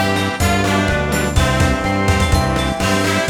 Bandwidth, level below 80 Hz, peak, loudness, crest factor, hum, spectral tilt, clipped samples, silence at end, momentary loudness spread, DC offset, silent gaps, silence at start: 17.5 kHz; -24 dBFS; -2 dBFS; -16 LUFS; 14 dB; none; -5 dB/octave; under 0.1%; 0 s; 2 LU; under 0.1%; none; 0 s